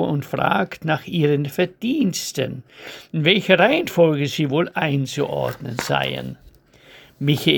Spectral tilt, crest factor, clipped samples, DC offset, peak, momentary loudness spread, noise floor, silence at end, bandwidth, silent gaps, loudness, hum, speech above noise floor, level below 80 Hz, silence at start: -5 dB/octave; 20 dB; under 0.1%; under 0.1%; 0 dBFS; 12 LU; -49 dBFS; 0 s; over 20 kHz; none; -20 LUFS; none; 29 dB; -56 dBFS; 0 s